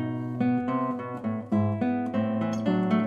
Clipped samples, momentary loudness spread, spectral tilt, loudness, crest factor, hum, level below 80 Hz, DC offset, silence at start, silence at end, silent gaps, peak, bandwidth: under 0.1%; 6 LU; -8.5 dB/octave; -28 LUFS; 14 dB; none; -64 dBFS; under 0.1%; 0 s; 0 s; none; -12 dBFS; 7 kHz